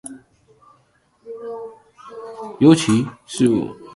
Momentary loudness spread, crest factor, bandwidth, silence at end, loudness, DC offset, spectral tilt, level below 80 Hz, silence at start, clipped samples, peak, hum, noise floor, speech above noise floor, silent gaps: 24 LU; 20 dB; 11.5 kHz; 0 s; -17 LUFS; under 0.1%; -6 dB/octave; -58 dBFS; 0.05 s; under 0.1%; 0 dBFS; none; -60 dBFS; 43 dB; none